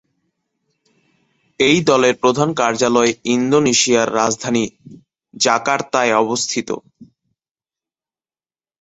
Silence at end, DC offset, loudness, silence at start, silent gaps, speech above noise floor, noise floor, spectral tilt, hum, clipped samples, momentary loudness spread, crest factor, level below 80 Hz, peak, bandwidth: 1.8 s; under 0.1%; -16 LUFS; 1.6 s; none; over 74 dB; under -90 dBFS; -3.5 dB/octave; none; under 0.1%; 7 LU; 18 dB; -58 dBFS; 0 dBFS; 8.2 kHz